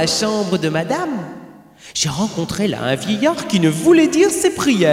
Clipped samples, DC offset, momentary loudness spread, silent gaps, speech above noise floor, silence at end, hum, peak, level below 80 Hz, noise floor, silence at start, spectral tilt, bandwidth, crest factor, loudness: under 0.1%; under 0.1%; 11 LU; none; 22 dB; 0 s; none; -2 dBFS; -50 dBFS; -38 dBFS; 0 s; -4.5 dB/octave; 16 kHz; 14 dB; -17 LUFS